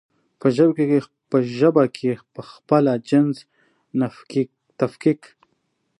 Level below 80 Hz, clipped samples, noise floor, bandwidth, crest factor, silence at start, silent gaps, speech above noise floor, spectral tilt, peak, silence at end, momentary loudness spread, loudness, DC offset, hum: -70 dBFS; under 0.1%; -71 dBFS; 11 kHz; 18 dB; 0.45 s; none; 51 dB; -8 dB/octave; -2 dBFS; 0.85 s; 13 LU; -21 LUFS; under 0.1%; none